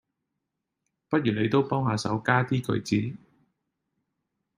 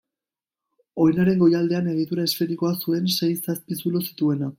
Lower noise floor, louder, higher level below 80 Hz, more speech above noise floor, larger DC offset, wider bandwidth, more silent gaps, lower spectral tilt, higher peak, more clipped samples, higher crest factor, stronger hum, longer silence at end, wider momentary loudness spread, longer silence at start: second, -83 dBFS vs under -90 dBFS; second, -26 LUFS vs -22 LUFS; about the same, -64 dBFS vs -62 dBFS; second, 58 dB vs over 68 dB; neither; about the same, 15.5 kHz vs 16.5 kHz; neither; about the same, -6.5 dB/octave vs -6 dB/octave; about the same, -6 dBFS vs -8 dBFS; neither; first, 22 dB vs 16 dB; neither; first, 1.4 s vs 0.05 s; second, 4 LU vs 8 LU; first, 1.1 s vs 0.95 s